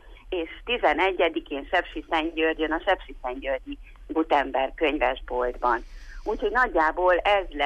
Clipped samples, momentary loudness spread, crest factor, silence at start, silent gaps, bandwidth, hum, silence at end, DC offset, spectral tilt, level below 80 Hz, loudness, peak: under 0.1%; 11 LU; 16 dB; 0.05 s; none; 9.6 kHz; none; 0 s; under 0.1%; -5 dB/octave; -42 dBFS; -25 LUFS; -10 dBFS